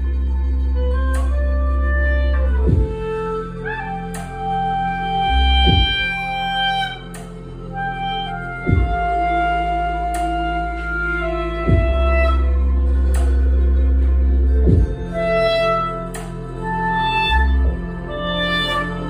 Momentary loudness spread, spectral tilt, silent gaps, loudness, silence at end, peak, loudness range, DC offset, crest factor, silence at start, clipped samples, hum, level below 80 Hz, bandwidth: 10 LU; -6.5 dB/octave; none; -19 LUFS; 0 s; -2 dBFS; 4 LU; under 0.1%; 16 dB; 0 s; under 0.1%; none; -20 dBFS; 10 kHz